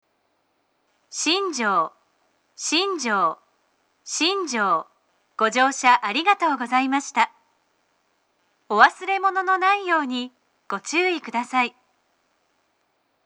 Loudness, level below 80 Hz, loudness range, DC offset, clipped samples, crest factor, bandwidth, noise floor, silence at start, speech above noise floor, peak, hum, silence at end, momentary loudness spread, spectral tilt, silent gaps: -21 LUFS; -80 dBFS; 3 LU; under 0.1%; under 0.1%; 24 dB; 11 kHz; -69 dBFS; 1.1 s; 48 dB; 0 dBFS; none; 1.55 s; 13 LU; -1.5 dB/octave; none